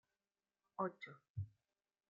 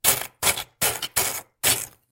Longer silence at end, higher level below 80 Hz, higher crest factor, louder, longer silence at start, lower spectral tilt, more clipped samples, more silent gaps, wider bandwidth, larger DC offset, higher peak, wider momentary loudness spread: first, 0.6 s vs 0.2 s; second, -82 dBFS vs -52 dBFS; about the same, 24 dB vs 22 dB; second, -49 LUFS vs -23 LUFS; first, 0.8 s vs 0.05 s; first, -6.5 dB/octave vs 0 dB/octave; neither; first, 1.29-1.35 s vs none; second, 6.8 kHz vs 17 kHz; neither; second, -28 dBFS vs -4 dBFS; first, 11 LU vs 3 LU